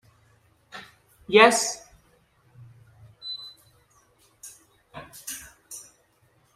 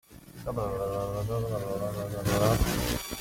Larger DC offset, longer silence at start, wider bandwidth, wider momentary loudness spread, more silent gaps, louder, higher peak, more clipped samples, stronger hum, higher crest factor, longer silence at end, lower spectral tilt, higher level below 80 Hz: neither; first, 0.75 s vs 0.1 s; about the same, 16 kHz vs 16.5 kHz; first, 29 LU vs 9 LU; neither; first, -22 LUFS vs -30 LUFS; first, -2 dBFS vs -10 dBFS; neither; neither; first, 28 dB vs 20 dB; first, 0.75 s vs 0 s; second, -2 dB/octave vs -5.5 dB/octave; second, -66 dBFS vs -40 dBFS